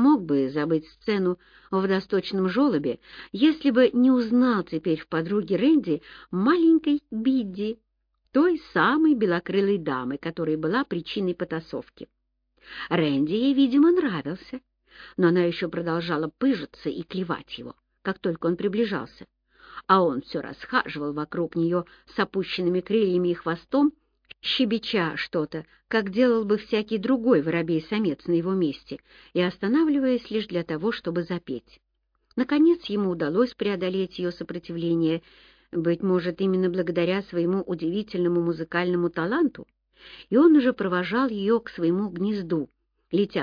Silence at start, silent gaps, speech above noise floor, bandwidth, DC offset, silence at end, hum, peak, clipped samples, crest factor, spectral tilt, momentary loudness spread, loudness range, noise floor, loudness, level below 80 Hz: 0 s; none; 47 dB; 5.2 kHz; under 0.1%; 0 s; none; -6 dBFS; under 0.1%; 20 dB; -8.5 dB/octave; 12 LU; 4 LU; -71 dBFS; -24 LUFS; -60 dBFS